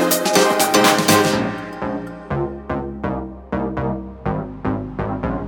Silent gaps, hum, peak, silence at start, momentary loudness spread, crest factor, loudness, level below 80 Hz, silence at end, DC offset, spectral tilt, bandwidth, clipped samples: none; none; -2 dBFS; 0 s; 13 LU; 18 dB; -19 LUFS; -38 dBFS; 0 s; under 0.1%; -4 dB/octave; 18 kHz; under 0.1%